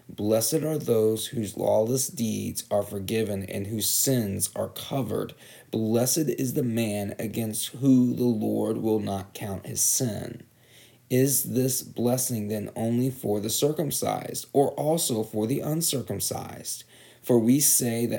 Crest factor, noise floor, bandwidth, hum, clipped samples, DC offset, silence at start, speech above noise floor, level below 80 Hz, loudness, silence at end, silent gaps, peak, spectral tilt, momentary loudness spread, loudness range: 18 dB; -55 dBFS; over 20 kHz; none; under 0.1%; under 0.1%; 0.1 s; 29 dB; -68 dBFS; -26 LUFS; 0 s; none; -8 dBFS; -4.5 dB/octave; 10 LU; 2 LU